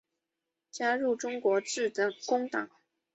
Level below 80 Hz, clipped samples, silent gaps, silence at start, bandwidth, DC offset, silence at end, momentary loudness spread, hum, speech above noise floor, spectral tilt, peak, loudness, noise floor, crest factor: -82 dBFS; under 0.1%; none; 0.75 s; 8.2 kHz; under 0.1%; 0.5 s; 7 LU; none; 57 dB; -2.5 dB/octave; -16 dBFS; -31 LUFS; -87 dBFS; 16 dB